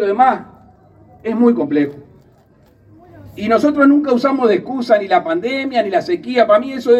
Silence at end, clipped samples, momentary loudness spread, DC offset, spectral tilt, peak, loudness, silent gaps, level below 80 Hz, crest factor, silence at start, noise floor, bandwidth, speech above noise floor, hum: 0 s; under 0.1%; 8 LU; under 0.1%; -6.5 dB/octave; 0 dBFS; -15 LUFS; none; -56 dBFS; 16 dB; 0 s; -50 dBFS; 8.4 kHz; 36 dB; none